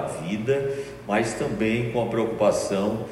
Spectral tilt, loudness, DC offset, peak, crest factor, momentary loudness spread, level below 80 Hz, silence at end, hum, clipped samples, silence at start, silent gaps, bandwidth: -5.5 dB/octave; -25 LUFS; under 0.1%; -6 dBFS; 18 dB; 6 LU; -52 dBFS; 0 s; none; under 0.1%; 0 s; none; 14.5 kHz